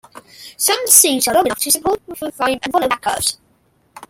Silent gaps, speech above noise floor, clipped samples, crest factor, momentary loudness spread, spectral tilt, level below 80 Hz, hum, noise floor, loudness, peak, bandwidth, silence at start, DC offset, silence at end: none; 42 dB; under 0.1%; 18 dB; 12 LU; -1 dB/octave; -52 dBFS; none; -58 dBFS; -14 LUFS; 0 dBFS; 16.5 kHz; 0.15 s; under 0.1%; 0.05 s